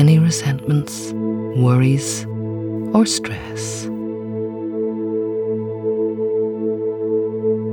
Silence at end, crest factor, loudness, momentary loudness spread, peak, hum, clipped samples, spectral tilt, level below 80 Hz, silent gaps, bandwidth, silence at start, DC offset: 0 s; 16 dB; -20 LUFS; 10 LU; -4 dBFS; none; under 0.1%; -6 dB/octave; -54 dBFS; none; 18.5 kHz; 0 s; under 0.1%